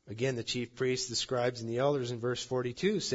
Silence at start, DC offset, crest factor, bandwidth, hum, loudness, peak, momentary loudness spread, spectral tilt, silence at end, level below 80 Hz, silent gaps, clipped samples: 0.05 s; under 0.1%; 16 dB; 8 kHz; none; -33 LUFS; -16 dBFS; 4 LU; -4.5 dB/octave; 0 s; -66 dBFS; none; under 0.1%